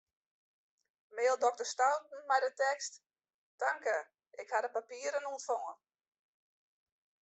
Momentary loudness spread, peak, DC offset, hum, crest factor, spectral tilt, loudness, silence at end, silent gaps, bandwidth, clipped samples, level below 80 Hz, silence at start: 11 LU; -16 dBFS; under 0.1%; none; 20 dB; 1 dB/octave; -35 LUFS; 1.45 s; 3.34-3.58 s; 8.4 kHz; under 0.1%; under -90 dBFS; 1.15 s